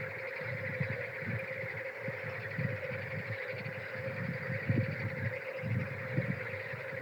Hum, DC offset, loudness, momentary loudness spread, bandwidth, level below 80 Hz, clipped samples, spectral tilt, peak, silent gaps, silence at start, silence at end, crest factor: none; under 0.1%; -37 LUFS; 5 LU; 19 kHz; -78 dBFS; under 0.1%; -8 dB/octave; -18 dBFS; none; 0 s; 0 s; 18 dB